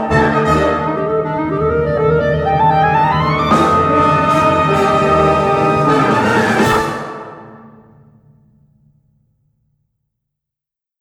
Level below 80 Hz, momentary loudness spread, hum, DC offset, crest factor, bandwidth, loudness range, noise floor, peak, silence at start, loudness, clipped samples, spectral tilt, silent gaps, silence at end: -36 dBFS; 6 LU; none; under 0.1%; 14 dB; 17.5 kHz; 7 LU; -86 dBFS; 0 dBFS; 0 s; -13 LUFS; under 0.1%; -6.5 dB/octave; none; 3.35 s